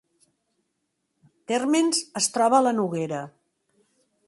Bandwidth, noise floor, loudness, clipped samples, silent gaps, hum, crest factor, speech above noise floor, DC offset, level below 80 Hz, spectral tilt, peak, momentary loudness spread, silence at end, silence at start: 11.5 kHz; -77 dBFS; -23 LUFS; under 0.1%; none; none; 20 dB; 54 dB; under 0.1%; -74 dBFS; -3.5 dB/octave; -8 dBFS; 12 LU; 1 s; 1.5 s